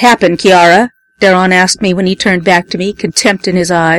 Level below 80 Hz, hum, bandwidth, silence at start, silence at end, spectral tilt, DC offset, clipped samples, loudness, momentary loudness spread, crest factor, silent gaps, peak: -44 dBFS; none; 14.5 kHz; 0 s; 0 s; -4 dB/octave; under 0.1%; 0.5%; -9 LUFS; 7 LU; 10 dB; none; 0 dBFS